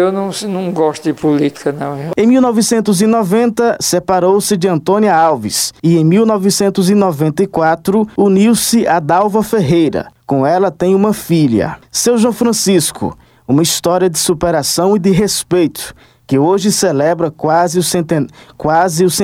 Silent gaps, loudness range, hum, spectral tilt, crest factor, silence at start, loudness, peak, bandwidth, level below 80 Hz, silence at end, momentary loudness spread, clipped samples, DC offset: none; 2 LU; none; -5 dB/octave; 10 dB; 0 s; -12 LUFS; -2 dBFS; 16.5 kHz; -46 dBFS; 0 s; 7 LU; under 0.1%; under 0.1%